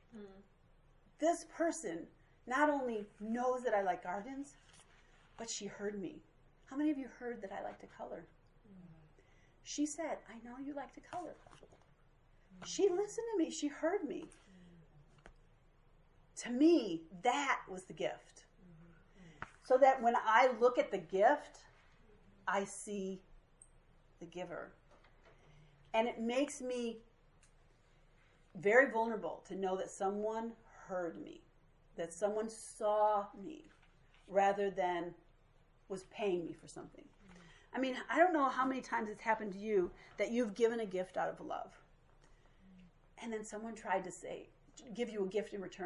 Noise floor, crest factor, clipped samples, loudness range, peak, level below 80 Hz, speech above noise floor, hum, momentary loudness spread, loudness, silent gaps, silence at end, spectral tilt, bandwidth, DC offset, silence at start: -67 dBFS; 24 dB; under 0.1%; 11 LU; -14 dBFS; -70 dBFS; 31 dB; none; 21 LU; -37 LUFS; none; 0 s; -4 dB/octave; 11.5 kHz; under 0.1%; 0.15 s